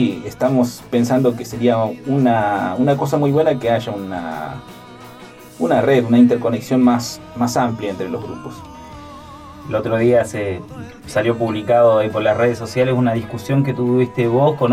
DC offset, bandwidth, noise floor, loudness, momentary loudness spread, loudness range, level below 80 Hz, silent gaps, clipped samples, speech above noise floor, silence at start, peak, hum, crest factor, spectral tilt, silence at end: under 0.1%; 15.5 kHz; -39 dBFS; -17 LUFS; 20 LU; 5 LU; -50 dBFS; none; under 0.1%; 22 dB; 0 s; -2 dBFS; none; 16 dB; -7 dB/octave; 0 s